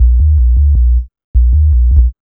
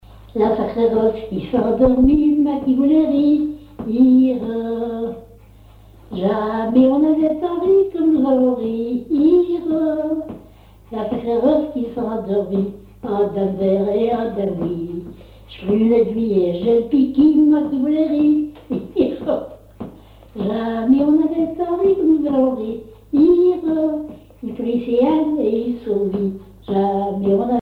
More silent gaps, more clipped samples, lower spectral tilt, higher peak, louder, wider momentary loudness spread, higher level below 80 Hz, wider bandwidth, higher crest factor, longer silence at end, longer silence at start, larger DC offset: first, 1.24-1.34 s vs none; first, 0.2% vs under 0.1%; first, -13.5 dB/octave vs -9.5 dB/octave; first, 0 dBFS vs -4 dBFS; first, -12 LUFS vs -18 LUFS; second, 5 LU vs 13 LU; first, -8 dBFS vs -42 dBFS; second, 0.5 kHz vs 4.6 kHz; second, 8 dB vs 14 dB; about the same, 0.1 s vs 0 s; second, 0 s vs 0.15 s; neither